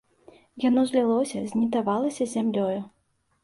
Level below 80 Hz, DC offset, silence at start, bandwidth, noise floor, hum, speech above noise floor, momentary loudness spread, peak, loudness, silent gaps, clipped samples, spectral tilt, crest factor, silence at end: -68 dBFS; under 0.1%; 0.55 s; 11.5 kHz; -55 dBFS; none; 31 dB; 7 LU; -10 dBFS; -25 LUFS; none; under 0.1%; -6 dB/octave; 16 dB; 0.55 s